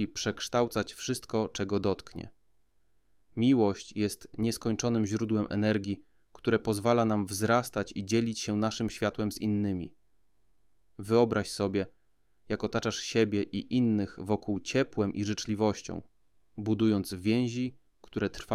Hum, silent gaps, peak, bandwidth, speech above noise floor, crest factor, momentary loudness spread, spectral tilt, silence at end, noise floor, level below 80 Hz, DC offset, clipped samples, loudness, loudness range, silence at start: none; none; -12 dBFS; 15.5 kHz; 44 dB; 20 dB; 11 LU; -5.5 dB/octave; 0 s; -74 dBFS; -58 dBFS; under 0.1%; under 0.1%; -30 LUFS; 3 LU; 0 s